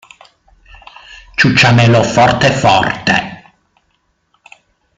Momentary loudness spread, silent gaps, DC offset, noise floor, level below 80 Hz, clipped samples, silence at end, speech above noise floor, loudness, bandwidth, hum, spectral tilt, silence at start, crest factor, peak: 8 LU; none; under 0.1%; -62 dBFS; -42 dBFS; under 0.1%; 1.6 s; 52 dB; -10 LUFS; 9.2 kHz; none; -5 dB/octave; 1.1 s; 14 dB; 0 dBFS